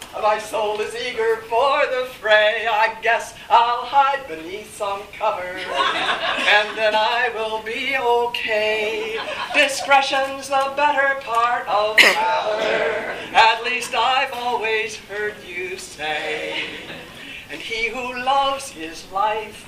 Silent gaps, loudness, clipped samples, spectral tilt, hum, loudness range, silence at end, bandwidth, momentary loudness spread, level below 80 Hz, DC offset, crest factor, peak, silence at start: none; -19 LUFS; under 0.1%; -1.5 dB/octave; none; 7 LU; 0 s; 15.5 kHz; 12 LU; -54 dBFS; under 0.1%; 20 dB; 0 dBFS; 0 s